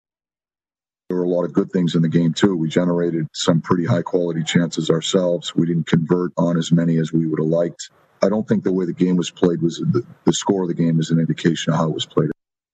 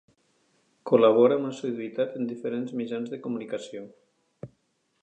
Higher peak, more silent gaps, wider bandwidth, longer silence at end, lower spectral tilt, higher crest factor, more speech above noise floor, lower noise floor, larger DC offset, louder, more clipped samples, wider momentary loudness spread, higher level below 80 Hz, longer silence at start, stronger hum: first, -2 dBFS vs -6 dBFS; neither; about the same, 8.6 kHz vs 9 kHz; second, 0.4 s vs 0.55 s; about the same, -6 dB/octave vs -6.5 dB/octave; about the same, 18 dB vs 22 dB; first, over 71 dB vs 46 dB; first, under -90 dBFS vs -72 dBFS; neither; first, -19 LUFS vs -26 LUFS; neither; second, 4 LU vs 25 LU; first, -58 dBFS vs -78 dBFS; first, 1.1 s vs 0.85 s; neither